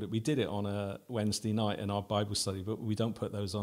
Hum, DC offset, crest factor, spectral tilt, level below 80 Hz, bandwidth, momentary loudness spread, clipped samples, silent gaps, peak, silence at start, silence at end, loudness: none; under 0.1%; 16 dB; -5.5 dB/octave; -64 dBFS; 16 kHz; 5 LU; under 0.1%; none; -18 dBFS; 0 s; 0 s; -34 LUFS